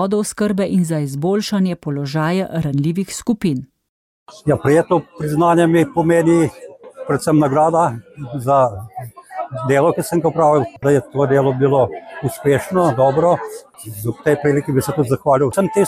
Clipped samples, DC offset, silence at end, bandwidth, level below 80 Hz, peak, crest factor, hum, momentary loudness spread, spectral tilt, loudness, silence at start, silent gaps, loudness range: under 0.1%; under 0.1%; 0 s; 16 kHz; -50 dBFS; -4 dBFS; 14 dB; none; 11 LU; -6.5 dB/octave; -17 LUFS; 0 s; 3.89-4.26 s; 4 LU